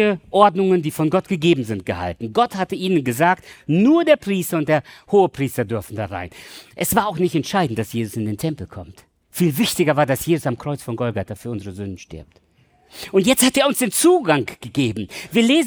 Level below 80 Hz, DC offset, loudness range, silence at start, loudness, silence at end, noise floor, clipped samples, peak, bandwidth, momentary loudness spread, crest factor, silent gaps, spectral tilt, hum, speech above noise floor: -54 dBFS; under 0.1%; 5 LU; 0 s; -19 LUFS; 0 s; -57 dBFS; under 0.1%; -2 dBFS; over 20 kHz; 15 LU; 18 dB; none; -5 dB/octave; none; 37 dB